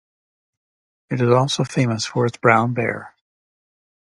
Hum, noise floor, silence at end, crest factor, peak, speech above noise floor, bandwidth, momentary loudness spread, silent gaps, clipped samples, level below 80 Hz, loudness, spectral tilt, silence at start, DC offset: none; under -90 dBFS; 0.95 s; 22 dB; 0 dBFS; over 71 dB; 11.5 kHz; 9 LU; none; under 0.1%; -60 dBFS; -19 LUFS; -5.5 dB/octave; 1.1 s; under 0.1%